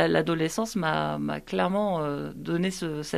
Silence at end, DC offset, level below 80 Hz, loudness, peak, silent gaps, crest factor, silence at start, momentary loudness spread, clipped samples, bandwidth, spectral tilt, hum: 0 s; under 0.1%; -54 dBFS; -28 LUFS; -8 dBFS; none; 18 dB; 0 s; 6 LU; under 0.1%; 14.5 kHz; -5.5 dB/octave; none